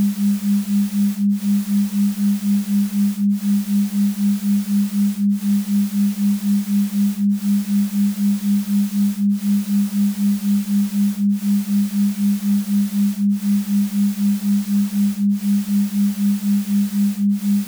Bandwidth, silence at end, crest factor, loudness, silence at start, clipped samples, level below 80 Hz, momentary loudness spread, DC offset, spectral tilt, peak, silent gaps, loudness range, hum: over 20 kHz; 0 s; 6 dB; -19 LUFS; 0 s; under 0.1%; -62 dBFS; 1 LU; under 0.1%; -6.5 dB/octave; -12 dBFS; none; 0 LU; none